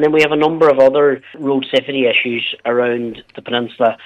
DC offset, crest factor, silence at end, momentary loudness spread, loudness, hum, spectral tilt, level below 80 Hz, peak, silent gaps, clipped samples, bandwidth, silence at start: under 0.1%; 14 dB; 0 s; 11 LU; -15 LUFS; none; -5.5 dB/octave; -60 dBFS; -2 dBFS; none; under 0.1%; 9.2 kHz; 0 s